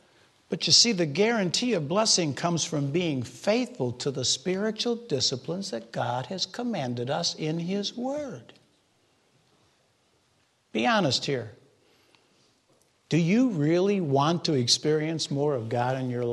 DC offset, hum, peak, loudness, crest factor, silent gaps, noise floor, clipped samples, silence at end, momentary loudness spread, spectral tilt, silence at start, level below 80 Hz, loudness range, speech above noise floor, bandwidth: under 0.1%; none; -4 dBFS; -26 LUFS; 22 dB; none; -68 dBFS; under 0.1%; 0 s; 9 LU; -4 dB/octave; 0.5 s; -70 dBFS; 9 LU; 42 dB; 12 kHz